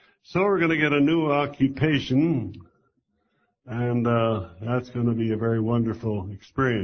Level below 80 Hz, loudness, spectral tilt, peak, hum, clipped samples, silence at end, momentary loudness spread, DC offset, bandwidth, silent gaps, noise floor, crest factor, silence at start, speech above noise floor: -52 dBFS; -24 LUFS; -8 dB/octave; -6 dBFS; none; under 0.1%; 0 s; 9 LU; under 0.1%; 6.6 kHz; none; -72 dBFS; 18 dB; 0.3 s; 49 dB